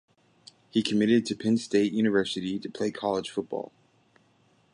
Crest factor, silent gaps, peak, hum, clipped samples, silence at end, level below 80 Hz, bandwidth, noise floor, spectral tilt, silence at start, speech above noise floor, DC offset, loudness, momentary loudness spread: 18 dB; none; -10 dBFS; none; under 0.1%; 1.05 s; -68 dBFS; 11 kHz; -65 dBFS; -5.5 dB/octave; 0.75 s; 38 dB; under 0.1%; -27 LUFS; 10 LU